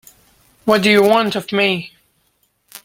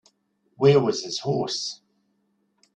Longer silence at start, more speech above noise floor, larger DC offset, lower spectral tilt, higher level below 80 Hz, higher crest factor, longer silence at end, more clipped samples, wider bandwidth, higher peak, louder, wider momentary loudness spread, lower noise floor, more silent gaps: about the same, 0.65 s vs 0.6 s; about the same, 49 dB vs 48 dB; neither; about the same, -4.5 dB/octave vs -5.5 dB/octave; first, -58 dBFS vs -64 dBFS; about the same, 16 dB vs 20 dB; about the same, 0.95 s vs 1 s; neither; first, 17 kHz vs 9 kHz; first, -2 dBFS vs -6 dBFS; first, -15 LUFS vs -23 LUFS; about the same, 13 LU vs 13 LU; second, -63 dBFS vs -70 dBFS; neither